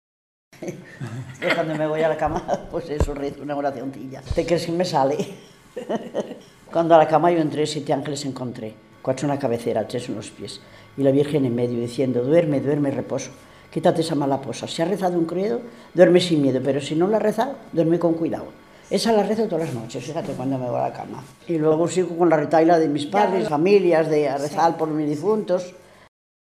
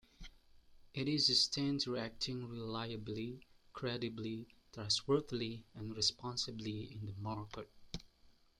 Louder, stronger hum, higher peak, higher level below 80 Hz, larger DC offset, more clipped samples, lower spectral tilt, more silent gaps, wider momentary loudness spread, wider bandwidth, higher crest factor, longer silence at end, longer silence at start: first, -22 LUFS vs -38 LUFS; neither; first, 0 dBFS vs -18 dBFS; first, -44 dBFS vs -64 dBFS; neither; neither; first, -6 dB/octave vs -4 dB/octave; neither; about the same, 16 LU vs 18 LU; about the same, 14.5 kHz vs 13.5 kHz; about the same, 22 dB vs 22 dB; first, 0.8 s vs 0.3 s; first, 0.55 s vs 0.2 s